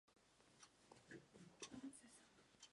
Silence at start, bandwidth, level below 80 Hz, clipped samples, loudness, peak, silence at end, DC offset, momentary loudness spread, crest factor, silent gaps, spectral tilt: 0.05 s; 11 kHz; -88 dBFS; under 0.1%; -62 LUFS; -40 dBFS; 0 s; under 0.1%; 12 LU; 22 dB; none; -3 dB/octave